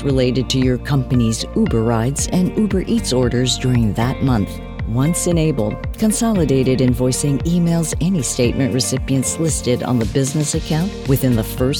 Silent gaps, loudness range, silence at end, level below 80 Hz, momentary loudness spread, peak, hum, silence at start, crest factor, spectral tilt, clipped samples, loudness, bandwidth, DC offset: none; 1 LU; 0 s; -30 dBFS; 3 LU; -4 dBFS; none; 0 s; 12 dB; -5.5 dB/octave; under 0.1%; -17 LUFS; 19.5 kHz; 0.1%